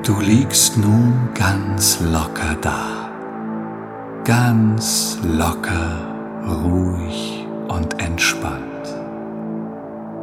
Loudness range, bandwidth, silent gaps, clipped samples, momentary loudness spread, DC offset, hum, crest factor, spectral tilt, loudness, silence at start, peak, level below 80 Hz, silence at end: 5 LU; 16.5 kHz; none; under 0.1%; 14 LU; under 0.1%; none; 18 dB; -4 dB/octave; -19 LUFS; 0 s; 0 dBFS; -36 dBFS; 0 s